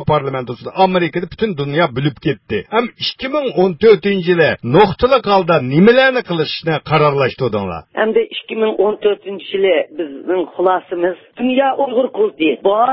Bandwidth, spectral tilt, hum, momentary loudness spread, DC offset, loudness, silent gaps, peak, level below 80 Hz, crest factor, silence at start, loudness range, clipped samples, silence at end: 5.8 kHz; -9.5 dB/octave; none; 9 LU; under 0.1%; -15 LUFS; none; 0 dBFS; -46 dBFS; 14 dB; 0 s; 5 LU; under 0.1%; 0 s